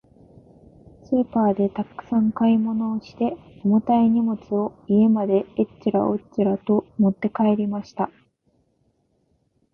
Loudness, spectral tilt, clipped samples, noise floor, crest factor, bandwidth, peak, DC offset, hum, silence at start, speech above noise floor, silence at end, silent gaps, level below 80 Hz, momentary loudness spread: -22 LUFS; -10 dB/octave; under 0.1%; -67 dBFS; 16 dB; 5.4 kHz; -6 dBFS; under 0.1%; none; 1.1 s; 46 dB; 1.65 s; none; -58 dBFS; 9 LU